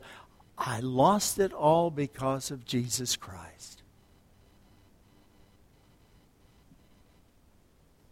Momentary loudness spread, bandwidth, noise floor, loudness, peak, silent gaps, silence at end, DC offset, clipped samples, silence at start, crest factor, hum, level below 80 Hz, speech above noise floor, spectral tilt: 24 LU; 16.5 kHz; -62 dBFS; -28 LUFS; -10 dBFS; none; 4.4 s; under 0.1%; under 0.1%; 0 s; 22 dB; none; -62 dBFS; 34 dB; -4.5 dB/octave